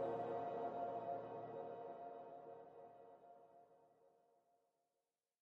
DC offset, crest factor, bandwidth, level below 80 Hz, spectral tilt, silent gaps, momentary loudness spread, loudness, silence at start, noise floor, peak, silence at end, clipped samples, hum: under 0.1%; 18 dB; 6.4 kHz; -90 dBFS; -6 dB/octave; none; 19 LU; -49 LUFS; 0 s; under -90 dBFS; -34 dBFS; 1.35 s; under 0.1%; none